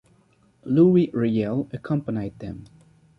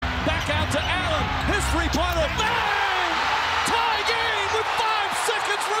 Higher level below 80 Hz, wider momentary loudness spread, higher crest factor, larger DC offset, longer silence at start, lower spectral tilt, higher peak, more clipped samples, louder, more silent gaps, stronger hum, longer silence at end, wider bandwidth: second, -56 dBFS vs -34 dBFS; first, 20 LU vs 2 LU; about the same, 18 dB vs 14 dB; neither; first, 0.65 s vs 0 s; first, -10.5 dB/octave vs -3.5 dB/octave; about the same, -6 dBFS vs -8 dBFS; neither; about the same, -22 LUFS vs -22 LUFS; neither; neither; first, 0.55 s vs 0 s; second, 5.8 kHz vs 16 kHz